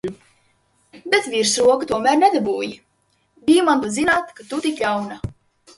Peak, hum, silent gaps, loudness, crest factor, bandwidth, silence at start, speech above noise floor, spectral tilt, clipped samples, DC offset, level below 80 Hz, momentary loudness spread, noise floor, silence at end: 0 dBFS; none; none; -19 LUFS; 20 dB; 11.5 kHz; 0.05 s; 47 dB; -3.5 dB/octave; under 0.1%; under 0.1%; -50 dBFS; 15 LU; -65 dBFS; 0.45 s